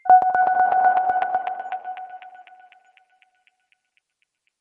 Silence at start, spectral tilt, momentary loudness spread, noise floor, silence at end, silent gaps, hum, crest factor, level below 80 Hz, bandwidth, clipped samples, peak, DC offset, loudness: 0.05 s; -5 dB/octave; 21 LU; -73 dBFS; 2.2 s; none; none; 18 dB; -68 dBFS; 3.7 kHz; under 0.1%; -4 dBFS; under 0.1%; -20 LUFS